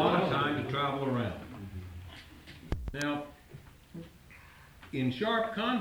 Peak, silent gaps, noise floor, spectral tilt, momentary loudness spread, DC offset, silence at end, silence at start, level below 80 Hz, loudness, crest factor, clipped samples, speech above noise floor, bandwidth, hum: -12 dBFS; none; -54 dBFS; -6 dB/octave; 23 LU; under 0.1%; 0 s; 0 s; -50 dBFS; -33 LUFS; 20 dB; under 0.1%; 23 dB; over 20 kHz; none